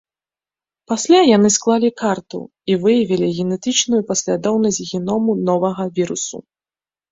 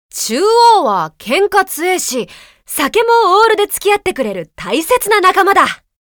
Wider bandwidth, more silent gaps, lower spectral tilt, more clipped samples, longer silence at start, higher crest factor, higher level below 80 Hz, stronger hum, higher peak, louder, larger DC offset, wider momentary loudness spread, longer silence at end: second, 8 kHz vs over 20 kHz; neither; first, -4.5 dB/octave vs -2 dB/octave; neither; first, 0.9 s vs 0.15 s; about the same, 16 dB vs 12 dB; second, -58 dBFS vs -50 dBFS; neither; about the same, -2 dBFS vs 0 dBFS; second, -17 LUFS vs -12 LUFS; neither; about the same, 12 LU vs 11 LU; first, 0.7 s vs 0.35 s